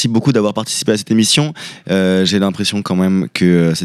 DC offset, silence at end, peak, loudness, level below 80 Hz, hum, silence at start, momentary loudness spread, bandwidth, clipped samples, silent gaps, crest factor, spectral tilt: under 0.1%; 0 s; -2 dBFS; -14 LUFS; -54 dBFS; none; 0 s; 6 LU; 14 kHz; under 0.1%; none; 12 dB; -5 dB/octave